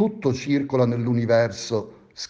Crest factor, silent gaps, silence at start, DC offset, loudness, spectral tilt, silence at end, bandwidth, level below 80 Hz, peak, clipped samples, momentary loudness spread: 16 dB; none; 0 s; under 0.1%; -23 LUFS; -6.5 dB/octave; 0.05 s; 7.8 kHz; -60 dBFS; -6 dBFS; under 0.1%; 8 LU